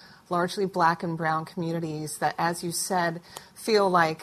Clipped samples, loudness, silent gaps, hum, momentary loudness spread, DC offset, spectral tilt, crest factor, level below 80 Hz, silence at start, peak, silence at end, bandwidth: under 0.1%; -27 LUFS; none; none; 9 LU; under 0.1%; -4.5 dB/octave; 20 dB; -66 dBFS; 0.05 s; -6 dBFS; 0 s; 14 kHz